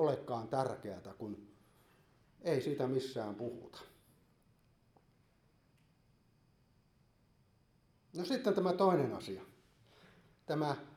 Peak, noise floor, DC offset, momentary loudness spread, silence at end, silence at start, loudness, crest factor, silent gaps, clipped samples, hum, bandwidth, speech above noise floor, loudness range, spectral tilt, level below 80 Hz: -18 dBFS; -71 dBFS; under 0.1%; 18 LU; 0 s; 0 s; -37 LUFS; 22 dB; none; under 0.1%; none; 15 kHz; 35 dB; 12 LU; -7 dB/octave; -76 dBFS